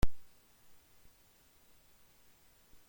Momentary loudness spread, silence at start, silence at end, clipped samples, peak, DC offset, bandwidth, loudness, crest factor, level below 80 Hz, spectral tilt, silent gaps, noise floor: 0 LU; 0 s; 0 s; under 0.1%; -16 dBFS; under 0.1%; 16.5 kHz; -56 LUFS; 22 dB; -46 dBFS; -5.5 dB/octave; none; -66 dBFS